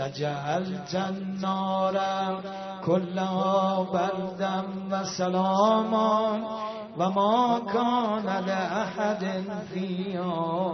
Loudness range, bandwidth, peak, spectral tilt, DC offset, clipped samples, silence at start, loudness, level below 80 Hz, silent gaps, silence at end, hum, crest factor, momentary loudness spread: 3 LU; 6.4 kHz; -10 dBFS; -6 dB/octave; under 0.1%; under 0.1%; 0 s; -27 LUFS; -70 dBFS; none; 0 s; none; 18 dB; 9 LU